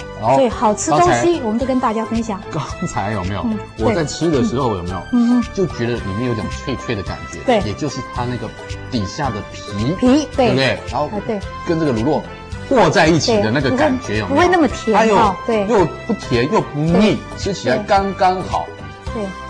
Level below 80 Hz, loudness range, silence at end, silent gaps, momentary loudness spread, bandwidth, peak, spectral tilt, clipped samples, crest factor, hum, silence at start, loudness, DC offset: -36 dBFS; 6 LU; 0 s; none; 11 LU; 10.5 kHz; -2 dBFS; -5.5 dB/octave; under 0.1%; 14 dB; none; 0 s; -17 LUFS; under 0.1%